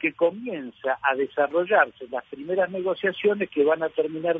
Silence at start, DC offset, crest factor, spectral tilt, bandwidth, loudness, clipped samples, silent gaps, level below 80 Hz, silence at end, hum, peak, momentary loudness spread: 0 s; under 0.1%; 18 dB; -8 dB/octave; 3.9 kHz; -25 LUFS; under 0.1%; none; -70 dBFS; 0 s; none; -6 dBFS; 12 LU